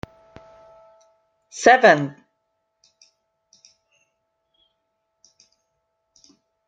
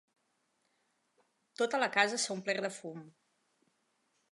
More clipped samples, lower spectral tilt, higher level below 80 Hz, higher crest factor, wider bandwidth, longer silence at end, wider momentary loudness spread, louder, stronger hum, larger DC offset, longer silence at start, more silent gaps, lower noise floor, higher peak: neither; first, -4 dB/octave vs -2 dB/octave; first, -64 dBFS vs under -90 dBFS; about the same, 26 dB vs 26 dB; second, 9.2 kHz vs 11.5 kHz; first, 4.6 s vs 1.2 s; first, 27 LU vs 17 LU; first, -16 LUFS vs -32 LUFS; neither; neither; about the same, 1.55 s vs 1.6 s; neither; about the same, -75 dBFS vs -78 dBFS; first, 0 dBFS vs -12 dBFS